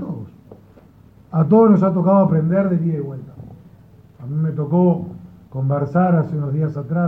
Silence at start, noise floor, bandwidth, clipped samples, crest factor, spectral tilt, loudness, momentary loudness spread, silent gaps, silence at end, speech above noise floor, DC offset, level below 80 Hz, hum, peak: 0 s; -47 dBFS; 2.9 kHz; under 0.1%; 14 dB; -12.5 dB/octave; -17 LUFS; 19 LU; none; 0 s; 31 dB; under 0.1%; -54 dBFS; none; -4 dBFS